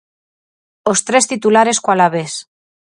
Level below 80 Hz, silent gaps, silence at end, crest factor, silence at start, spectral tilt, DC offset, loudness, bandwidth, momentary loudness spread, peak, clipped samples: -64 dBFS; none; 0.55 s; 16 dB; 0.85 s; -3 dB/octave; under 0.1%; -14 LUFS; 11.5 kHz; 11 LU; 0 dBFS; under 0.1%